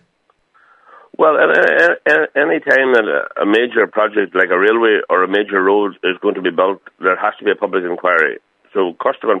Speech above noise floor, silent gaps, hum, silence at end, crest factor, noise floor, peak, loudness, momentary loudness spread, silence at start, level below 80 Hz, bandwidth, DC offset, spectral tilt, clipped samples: 47 dB; none; none; 0 s; 16 dB; -61 dBFS; 0 dBFS; -14 LUFS; 7 LU; 1.2 s; -70 dBFS; 8.4 kHz; under 0.1%; -5.5 dB/octave; under 0.1%